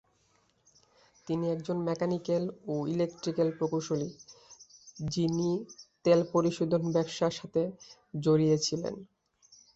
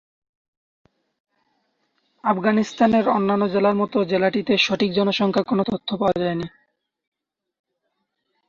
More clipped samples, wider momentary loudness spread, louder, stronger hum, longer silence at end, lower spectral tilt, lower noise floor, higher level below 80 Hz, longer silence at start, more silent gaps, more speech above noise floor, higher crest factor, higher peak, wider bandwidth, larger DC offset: neither; first, 17 LU vs 6 LU; second, -31 LUFS vs -20 LUFS; neither; second, 0.7 s vs 2 s; about the same, -6 dB/octave vs -6 dB/octave; second, -70 dBFS vs -76 dBFS; second, -66 dBFS vs -60 dBFS; second, 1.25 s vs 2.25 s; neither; second, 40 dB vs 56 dB; about the same, 20 dB vs 18 dB; second, -12 dBFS vs -4 dBFS; about the same, 8 kHz vs 7.4 kHz; neither